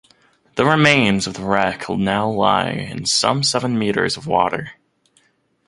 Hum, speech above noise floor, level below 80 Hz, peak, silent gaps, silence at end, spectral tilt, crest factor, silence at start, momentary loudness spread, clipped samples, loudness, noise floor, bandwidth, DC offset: none; 44 dB; -50 dBFS; 0 dBFS; none; 0.95 s; -4 dB/octave; 20 dB; 0.55 s; 9 LU; under 0.1%; -18 LUFS; -62 dBFS; 11.5 kHz; under 0.1%